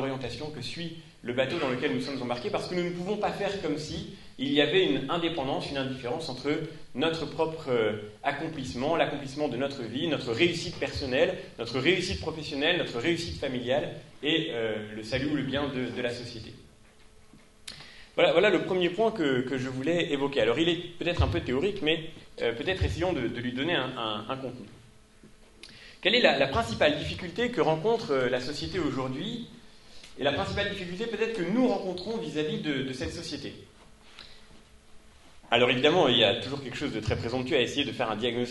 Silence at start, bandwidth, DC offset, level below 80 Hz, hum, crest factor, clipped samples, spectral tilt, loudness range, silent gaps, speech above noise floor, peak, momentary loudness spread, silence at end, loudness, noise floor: 0 s; 11.5 kHz; under 0.1%; -50 dBFS; none; 24 dB; under 0.1%; -5 dB/octave; 5 LU; none; 26 dB; -6 dBFS; 13 LU; 0 s; -28 LUFS; -54 dBFS